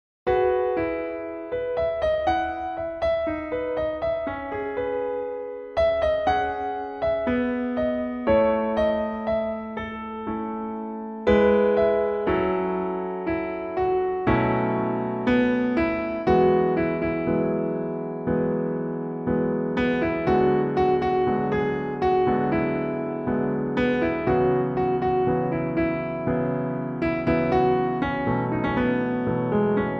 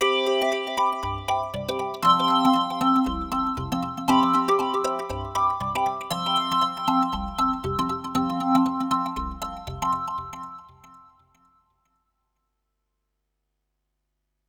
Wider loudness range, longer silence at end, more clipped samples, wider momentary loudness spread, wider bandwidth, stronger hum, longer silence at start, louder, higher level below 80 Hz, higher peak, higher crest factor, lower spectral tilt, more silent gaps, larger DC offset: second, 3 LU vs 11 LU; second, 0 s vs 3.5 s; neither; about the same, 9 LU vs 10 LU; second, 6.6 kHz vs over 20 kHz; second, none vs 50 Hz at -60 dBFS; first, 0.25 s vs 0 s; about the same, -24 LUFS vs -24 LUFS; about the same, -44 dBFS vs -46 dBFS; about the same, -6 dBFS vs -6 dBFS; about the same, 18 dB vs 20 dB; first, -9 dB/octave vs -4.5 dB/octave; neither; neither